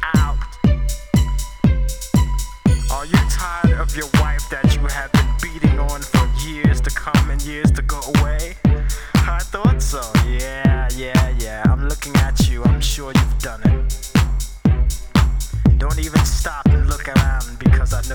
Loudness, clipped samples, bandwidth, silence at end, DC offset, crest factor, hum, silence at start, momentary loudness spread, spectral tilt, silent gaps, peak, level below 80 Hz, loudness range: -18 LUFS; under 0.1%; 20 kHz; 0 s; under 0.1%; 16 dB; none; 0 s; 5 LU; -5.5 dB/octave; none; 0 dBFS; -20 dBFS; 1 LU